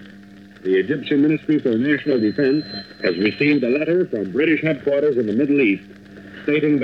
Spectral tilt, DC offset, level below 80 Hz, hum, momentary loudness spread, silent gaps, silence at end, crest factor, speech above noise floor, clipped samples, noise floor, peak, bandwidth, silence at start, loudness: -8.5 dB/octave; under 0.1%; -60 dBFS; none; 6 LU; none; 0 s; 14 dB; 24 dB; under 0.1%; -42 dBFS; -6 dBFS; 5.6 kHz; 0 s; -19 LUFS